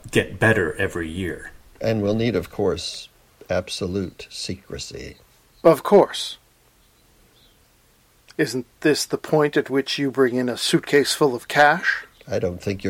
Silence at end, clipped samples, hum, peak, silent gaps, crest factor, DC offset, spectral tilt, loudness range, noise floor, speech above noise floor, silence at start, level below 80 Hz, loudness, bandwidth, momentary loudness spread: 0 s; under 0.1%; none; -2 dBFS; none; 20 dB; under 0.1%; -4.5 dB/octave; 7 LU; -58 dBFS; 37 dB; 0.05 s; -50 dBFS; -21 LUFS; 16.5 kHz; 16 LU